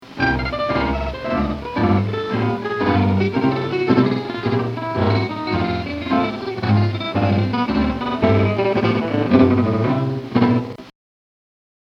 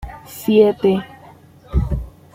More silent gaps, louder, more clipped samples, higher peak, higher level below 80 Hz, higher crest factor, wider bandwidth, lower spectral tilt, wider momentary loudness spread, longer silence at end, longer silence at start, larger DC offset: neither; about the same, -19 LUFS vs -18 LUFS; neither; about the same, 0 dBFS vs -2 dBFS; second, -38 dBFS vs -30 dBFS; about the same, 18 dB vs 16 dB; second, 6.8 kHz vs 16.5 kHz; about the same, -8.5 dB/octave vs -7.5 dB/octave; second, 6 LU vs 16 LU; first, 1.05 s vs 0.25 s; about the same, 0 s vs 0 s; neither